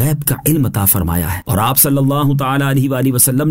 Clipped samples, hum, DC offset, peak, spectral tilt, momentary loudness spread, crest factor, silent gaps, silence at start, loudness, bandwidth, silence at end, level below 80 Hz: under 0.1%; none; under 0.1%; 0 dBFS; -5 dB/octave; 5 LU; 14 dB; none; 0 s; -13 LUFS; 16.5 kHz; 0 s; -34 dBFS